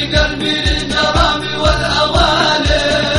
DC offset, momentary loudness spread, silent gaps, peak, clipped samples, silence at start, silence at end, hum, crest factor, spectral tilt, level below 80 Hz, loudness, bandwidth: under 0.1%; 3 LU; none; 0 dBFS; under 0.1%; 0 s; 0 s; none; 14 dB; -4 dB/octave; -22 dBFS; -13 LUFS; 11.5 kHz